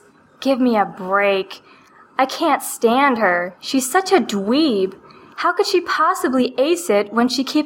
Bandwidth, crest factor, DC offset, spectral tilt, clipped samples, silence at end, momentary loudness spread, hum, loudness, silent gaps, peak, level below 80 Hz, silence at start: 17 kHz; 16 dB; under 0.1%; -3.5 dB/octave; under 0.1%; 0 s; 6 LU; none; -18 LUFS; none; -2 dBFS; -66 dBFS; 0.4 s